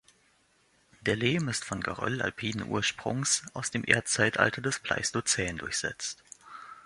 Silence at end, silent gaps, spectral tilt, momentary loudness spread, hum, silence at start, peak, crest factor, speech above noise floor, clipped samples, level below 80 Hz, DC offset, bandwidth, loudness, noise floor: 0.05 s; none; -3 dB/octave; 10 LU; none; 1 s; -4 dBFS; 28 dB; 37 dB; under 0.1%; -58 dBFS; under 0.1%; 11.5 kHz; -29 LUFS; -67 dBFS